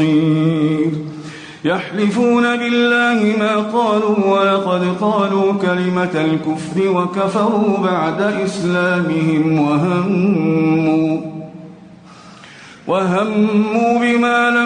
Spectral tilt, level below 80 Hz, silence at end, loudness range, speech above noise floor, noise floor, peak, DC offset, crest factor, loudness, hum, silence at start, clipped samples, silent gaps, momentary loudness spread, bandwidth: -7 dB/octave; -58 dBFS; 0 s; 4 LU; 25 dB; -40 dBFS; -4 dBFS; under 0.1%; 12 dB; -16 LUFS; none; 0 s; under 0.1%; none; 6 LU; 10 kHz